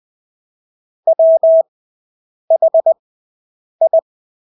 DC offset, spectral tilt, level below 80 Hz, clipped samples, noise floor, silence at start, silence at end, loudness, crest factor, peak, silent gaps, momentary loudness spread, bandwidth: under 0.1%; -9 dB/octave; -82 dBFS; under 0.1%; under -90 dBFS; 1.05 s; 0.6 s; -13 LUFS; 12 dB; -4 dBFS; 1.68-2.48 s, 2.99-3.79 s; 10 LU; 1.1 kHz